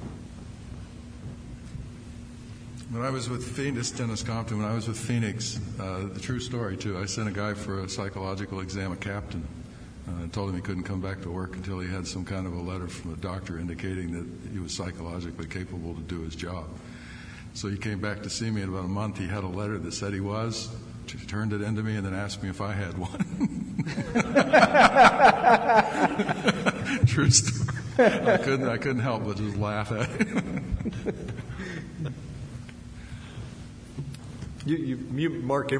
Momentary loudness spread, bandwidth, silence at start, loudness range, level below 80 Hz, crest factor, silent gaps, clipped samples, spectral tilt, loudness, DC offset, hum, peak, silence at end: 21 LU; 10.5 kHz; 0 s; 15 LU; -48 dBFS; 22 dB; none; under 0.1%; -5 dB/octave; -27 LUFS; under 0.1%; none; -6 dBFS; 0 s